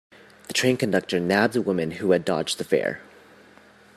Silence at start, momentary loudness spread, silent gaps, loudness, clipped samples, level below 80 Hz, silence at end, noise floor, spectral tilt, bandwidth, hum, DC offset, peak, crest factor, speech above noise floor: 0.5 s; 7 LU; none; -23 LUFS; under 0.1%; -66 dBFS; 0.95 s; -52 dBFS; -4.5 dB/octave; 14.5 kHz; none; under 0.1%; -4 dBFS; 20 dB; 29 dB